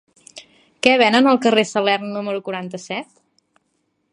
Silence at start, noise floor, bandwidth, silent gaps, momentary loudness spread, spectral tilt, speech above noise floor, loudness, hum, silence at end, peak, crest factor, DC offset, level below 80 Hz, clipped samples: 0.35 s; -69 dBFS; 11 kHz; none; 15 LU; -4 dB/octave; 52 dB; -18 LUFS; none; 1.1 s; 0 dBFS; 20 dB; under 0.1%; -66 dBFS; under 0.1%